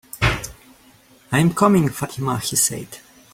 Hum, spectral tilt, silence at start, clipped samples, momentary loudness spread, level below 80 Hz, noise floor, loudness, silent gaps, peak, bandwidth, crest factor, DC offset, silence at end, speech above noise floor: none; -4.5 dB/octave; 0.15 s; under 0.1%; 18 LU; -40 dBFS; -51 dBFS; -19 LUFS; none; -2 dBFS; 16.5 kHz; 20 dB; under 0.1%; 0.35 s; 33 dB